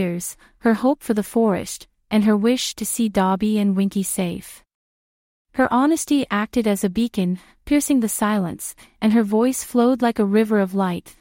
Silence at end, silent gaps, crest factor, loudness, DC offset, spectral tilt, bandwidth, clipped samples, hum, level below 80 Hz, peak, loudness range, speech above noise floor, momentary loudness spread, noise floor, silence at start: 0.1 s; 4.75-5.45 s; 16 dB; -20 LUFS; under 0.1%; -5 dB/octave; 16.5 kHz; under 0.1%; none; -52 dBFS; -4 dBFS; 2 LU; over 70 dB; 9 LU; under -90 dBFS; 0 s